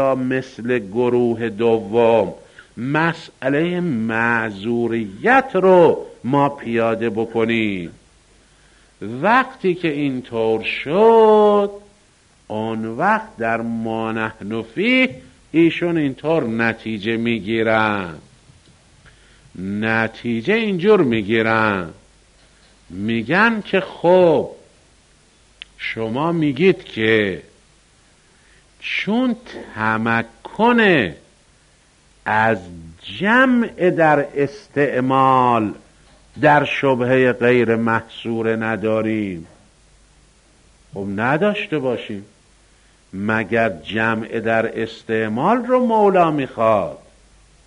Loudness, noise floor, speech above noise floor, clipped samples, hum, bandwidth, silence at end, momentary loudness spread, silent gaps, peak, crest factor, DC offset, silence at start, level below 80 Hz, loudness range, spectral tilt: -18 LUFS; -54 dBFS; 36 dB; under 0.1%; none; 10.5 kHz; 0.7 s; 12 LU; none; -2 dBFS; 18 dB; under 0.1%; 0 s; -54 dBFS; 6 LU; -7 dB/octave